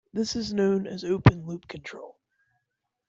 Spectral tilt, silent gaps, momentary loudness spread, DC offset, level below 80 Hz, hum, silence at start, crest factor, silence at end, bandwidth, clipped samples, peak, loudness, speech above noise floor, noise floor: -6.5 dB/octave; none; 19 LU; under 0.1%; -46 dBFS; none; 0.15 s; 24 dB; 1 s; 7.8 kHz; under 0.1%; -4 dBFS; -25 LUFS; 56 dB; -82 dBFS